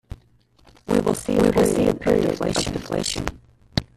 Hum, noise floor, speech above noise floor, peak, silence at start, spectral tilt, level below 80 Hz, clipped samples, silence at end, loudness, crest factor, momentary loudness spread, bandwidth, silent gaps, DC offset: none; -56 dBFS; 36 dB; -2 dBFS; 0.1 s; -5 dB/octave; -42 dBFS; under 0.1%; 0.15 s; -22 LUFS; 20 dB; 10 LU; 14 kHz; none; under 0.1%